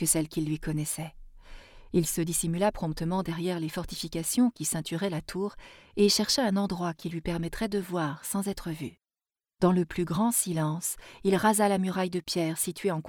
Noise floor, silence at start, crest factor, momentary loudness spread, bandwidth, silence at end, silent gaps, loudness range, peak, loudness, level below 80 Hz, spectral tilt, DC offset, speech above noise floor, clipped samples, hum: under -90 dBFS; 0 s; 18 dB; 10 LU; 20 kHz; 0 s; none; 4 LU; -10 dBFS; -29 LUFS; -50 dBFS; -4.5 dB/octave; under 0.1%; over 61 dB; under 0.1%; none